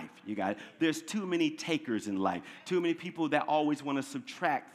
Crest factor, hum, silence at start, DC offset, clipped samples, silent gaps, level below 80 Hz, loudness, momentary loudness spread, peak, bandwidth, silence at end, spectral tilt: 20 dB; none; 0 s; under 0.1%; under 0.1%; none; -82 dBFS; -33 LUFS; 6 LU; -12 dBFS; 14 kHz; 0 s; -5 dB/octave